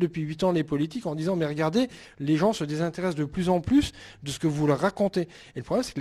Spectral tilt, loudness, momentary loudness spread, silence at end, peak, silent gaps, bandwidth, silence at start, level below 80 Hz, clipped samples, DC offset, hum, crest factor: -6.5 dB/octave; -27 LUFS; 9 LU; 0 s; -10 dBFS; none; 14 kHz; 0 s; -52 dBFS; under 0.1%; under 0.1%; none; 16 dB